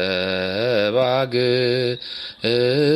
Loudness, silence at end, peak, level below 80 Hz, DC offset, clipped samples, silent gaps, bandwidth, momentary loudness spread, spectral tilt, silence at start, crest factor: -20 LUFS; 0 s; -6 dBFS; -60 dBFS; under 0.1%; under 0.1%; none; 13 kHz; 6 LU; -6.5 dB/octave; 0 s; 14 dB